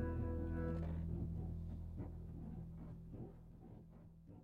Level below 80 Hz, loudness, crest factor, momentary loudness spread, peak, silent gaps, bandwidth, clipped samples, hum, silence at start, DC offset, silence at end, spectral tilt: -52 dBFS; -47 LUFS; 14 dB; 17 LU; -30 dBFS; none; 3.9 kHz; under 0.1%; none; 0 s; under 0.1%; 0 s; -10.5 dB/octave